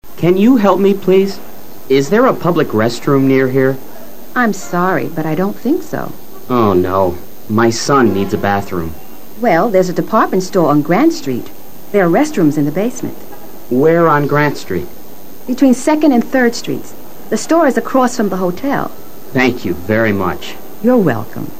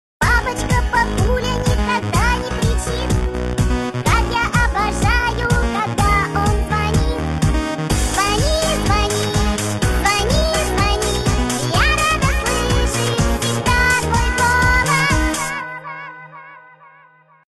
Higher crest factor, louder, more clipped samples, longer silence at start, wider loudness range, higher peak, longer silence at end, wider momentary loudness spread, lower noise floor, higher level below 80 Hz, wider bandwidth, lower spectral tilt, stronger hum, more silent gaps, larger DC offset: about the same, 14 dB vs 14 dB; first, -14 LUFS vs -17 LUFS; neither; second, 0 s vs 0.2 s; about the same, 3 LU vs 2 LU; first, 0 dBFS vs -4 dBFS; second, 0 s vs 0.9 s; first, 15 LU vs 5 LU; second, -36 dBFS vs -49 dBFS; second, -46 dBFS vs -22 dBFS; first, 16 kHz vs 13 kHz; first, -6 dB/octave vs -4 dB/octave; neither; neither; first, 7% vs under 0.1%